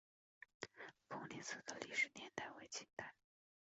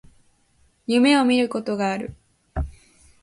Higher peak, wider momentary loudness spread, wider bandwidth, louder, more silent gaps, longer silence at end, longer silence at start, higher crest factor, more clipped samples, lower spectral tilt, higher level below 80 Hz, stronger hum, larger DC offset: second, -28 dBFS vs -6 dBFS; about the same, 16 LU vs 18 LU; second, 8 kHz vs 11.5 kHz; second, -48 LUFS vs -21 LUFS; first, 2.93-2.97 s vs none; about the same, 0.55 s vs 0.5 s; second, 0.6 s vs 0.9 s; about the same, 22 dB vs 18 dB; neither; second, -1 dB/octave vs -5 dB/octave; second, -86 dBFS vs -40 dBFS; neither; neither